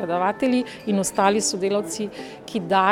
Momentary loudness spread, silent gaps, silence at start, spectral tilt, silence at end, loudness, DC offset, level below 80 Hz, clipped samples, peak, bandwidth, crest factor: 11 LU; none; 0 s; -4 dB/octave; 0 s; -23 LUFS; under 0.1%; -60 dBFS; under 0.1%; -4 dBFS; 16.5 kHz; 18 dB